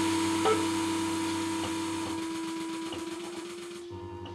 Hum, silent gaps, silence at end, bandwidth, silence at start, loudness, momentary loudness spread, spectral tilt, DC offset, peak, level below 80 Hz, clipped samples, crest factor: none; none; 0 s; 15 kHz; 0 s; -32 LUFS; 14 LU; -4 dB/octave; under 0.1%; -14 dBFS; -66 dBFS; under 0.1%; 18 dB